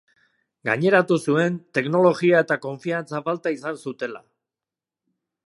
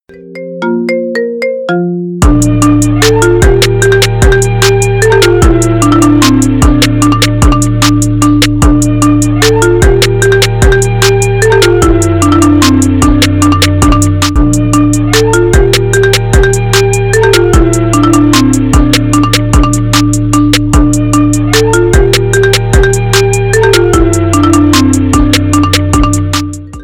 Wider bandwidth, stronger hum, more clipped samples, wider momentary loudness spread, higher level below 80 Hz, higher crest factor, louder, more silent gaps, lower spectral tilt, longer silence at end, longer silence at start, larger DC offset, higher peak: second, 11.5 kHz vs over 20 kHz; neither; second, under 0.1% vs 2%; first, 13 LU vs 3 LU; second, -74 dBFS vs -16 dBFS; first, 20 dB vs 6 dB; second, -22 LUFS vs -7 LUFS; neither; first, -6.5 dB/octave vs -5 dB/octave; first, 1.3 s vs 0 s; first, 0.65 s vs 0.15 s; neither; second, -4 dBFS vs 0 dBFS